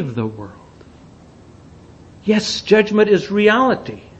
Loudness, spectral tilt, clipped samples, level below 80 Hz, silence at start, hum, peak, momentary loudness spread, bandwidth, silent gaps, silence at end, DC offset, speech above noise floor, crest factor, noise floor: -16 LUFS; -5 dB/octave; under 0.1%; -52 dBFS; 0 s; none; 0 dBFS; 13 LU; 8.4 kHz; none; 0.2 s; under 0.1%; 27 dB; 18 dB; -43 dBFS